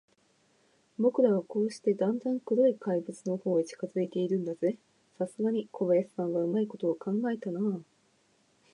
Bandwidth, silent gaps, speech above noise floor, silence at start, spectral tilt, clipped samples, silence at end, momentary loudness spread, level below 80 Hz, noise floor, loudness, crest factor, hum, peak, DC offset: 11 kHz; none; 39 dB; 1 s; -8 dB/octave; under 0.1%; 0.9 s; 8 LU; -84 dBFS; -69 dBFS; -30 LUFS; 18 dB; none; -12 dBFS; under 0.1%